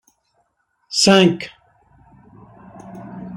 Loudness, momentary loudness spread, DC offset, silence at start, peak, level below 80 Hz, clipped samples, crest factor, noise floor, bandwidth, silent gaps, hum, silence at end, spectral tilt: -15 LUFS; 25 LU; under 0.1%; 0.9 s; -2 dBFS; -58 dBFS; under 0.1%; 20 dB; -67 dBFS; 13.5 kHz; none; none; 0 s; -4 dB/octave